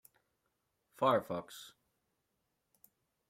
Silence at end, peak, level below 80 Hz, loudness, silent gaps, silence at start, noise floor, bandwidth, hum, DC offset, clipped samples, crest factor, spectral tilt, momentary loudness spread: 1.65 s; -16 dBFS; -80 dBFS; -34 LUFS; none; 1 s; -84 dBFS; 16 kHz; none; under 0.1%; under 0.1%; 24 dB; -5.5 dB/octave; 21 LU